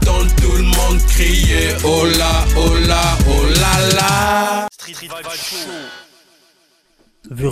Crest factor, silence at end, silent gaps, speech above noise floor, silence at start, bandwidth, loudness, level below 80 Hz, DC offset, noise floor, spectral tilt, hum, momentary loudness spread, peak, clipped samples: 14 dB; 0 s; none; 42 dB; 0 s; 15.5 kHz; -14 LUFS; -18 dBFS; under 0.1%; -56 dBFS; -4 dB/octave; none; 15 LU; 0 dBFS; under 0.1%